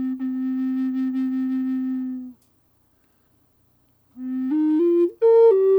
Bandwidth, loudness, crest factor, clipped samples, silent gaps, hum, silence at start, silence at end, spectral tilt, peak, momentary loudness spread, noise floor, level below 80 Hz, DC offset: over 20 kHz; -21 LUFS; 14 dB; under 0.1%; none; none; 0 s; 0 s; -8 dB/octave; -8 dBFS; 16 LU; -63 dBFS; -74 dBFS; under 0.1%